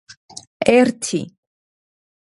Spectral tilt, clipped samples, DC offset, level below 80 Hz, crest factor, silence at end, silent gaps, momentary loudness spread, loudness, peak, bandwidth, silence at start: -4.5 dB/octave; under 0.1%; under 0.1%; -60 dBFS; 20 dB; 1.05 s; none; 23 LU; -17 LUFS; 0 dBFS; 11.5 kHz; 0.6 s